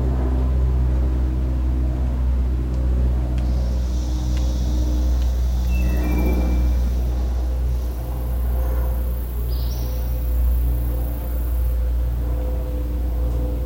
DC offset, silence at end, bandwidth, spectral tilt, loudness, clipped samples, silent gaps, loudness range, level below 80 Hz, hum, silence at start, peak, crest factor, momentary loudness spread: under 0.1%; 0 s; 16.5 kHz; -7.5 dB/octave; -23 LUFS; under 0.1%; none; 2 LU; -20 dBFS; none; 0 s; -10 dBFS; 10 dB; 5 LU